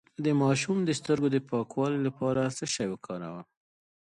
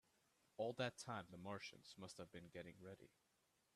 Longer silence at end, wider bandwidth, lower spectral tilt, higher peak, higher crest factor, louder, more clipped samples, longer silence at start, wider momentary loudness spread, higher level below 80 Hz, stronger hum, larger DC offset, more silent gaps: about the same, 0.75 s vs 0.7 s; second, 11 kHz vs 13.5 kHz; about the same, -5.5 dB/octave vs -4.5 dB/octave; first, -12 dBFS vs -30 dBFS; second, 16 dB vs 24 dB; first, -29 LUFS vs -52 LUFS; neither; second, 0.2 s vs 0.6 s; second, 12 LU vs 15 LU; first, -66 dBFS vs -86 dBFS; neither; neither; neither